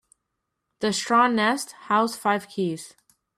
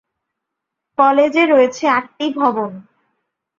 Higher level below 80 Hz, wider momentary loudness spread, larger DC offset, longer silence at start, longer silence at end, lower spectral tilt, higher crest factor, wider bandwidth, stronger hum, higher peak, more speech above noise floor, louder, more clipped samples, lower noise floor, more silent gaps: second, -72 dBFS vs -66 dBFS; about the same, 10 LU vs 12 LU; neither; second, 0.8 s vs 1 s; second, 0.5 s vs 0.8 s; about the same, -4 dB/octave vs -4.5 dB/octave; about the same, 16 dB vs 16 dB; first, 15 kHz vs 7.4 kHz; neither; second, -8 dBFS vs -2 dBFS; second, 57 dB vs 65 dB; second, -23 LUFS vs -15 LUFS; neither; about the same, -80 dBFS vs -80 dBFS; neither